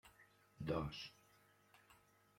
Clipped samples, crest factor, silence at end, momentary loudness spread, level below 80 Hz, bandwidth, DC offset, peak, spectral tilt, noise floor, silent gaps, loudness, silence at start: under 0.1%; 22 dB; 0.4 s; 26 LU; -66 dBFS; 16.5 kHz; under 0.1%; -28 dBFS; -6.5 dB/octave; -72 dBFS; none; -47 LUFS; 0.05 s